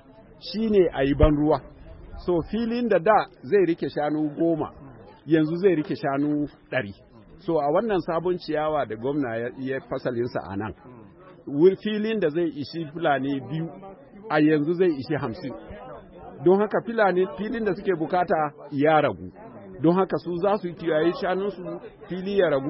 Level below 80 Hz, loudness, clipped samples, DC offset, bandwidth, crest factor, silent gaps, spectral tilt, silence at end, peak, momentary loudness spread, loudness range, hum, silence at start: -42 dBFS; -24 LUFS; under 0.1%; under 0.1%; 5.8 kHz; 18 dB; none; -11 dB/octave; 0 s; -6 dBFS; 16 LU; 3 LU; none; 0.2 s